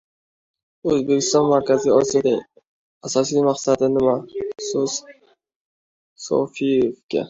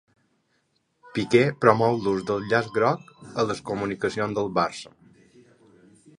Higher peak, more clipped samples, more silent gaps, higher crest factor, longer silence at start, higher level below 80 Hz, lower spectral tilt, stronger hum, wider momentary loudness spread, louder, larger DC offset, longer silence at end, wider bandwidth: about the same, -4 dBFS vs -2 dBFS; neither; first, 2.67-3.01 s, 5.56-6.16 s, 7.03-7.09 s vs none; second, 16 dB vs 24 dB; second, 0.85 s vs 1.15 s; about the same, -58 dBFS vs -60 dBFS; second, -4.5 dB/octave vs -6 dB/octave; neither; about the same, 11 LU vs 13 LU; first, -20 LUFS vs -24 LUFS; neither; second, 0 s vs 1.3 s; second, 7.8 kHz vs 11 kHz